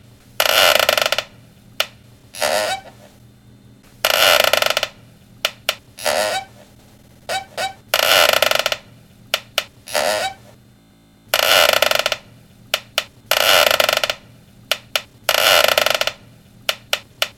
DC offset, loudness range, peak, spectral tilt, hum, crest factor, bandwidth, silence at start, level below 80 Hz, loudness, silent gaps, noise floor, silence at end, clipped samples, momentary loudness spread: under 0.1%; 5 LU; 0 dBFS; 0 dB/octave; none; 20 dB; 17.5 kHz; 0.4 s; -54 dBFS; -17 LUFS; none; -51 dBFS; 0.1 s; under 0.1%; 13 LU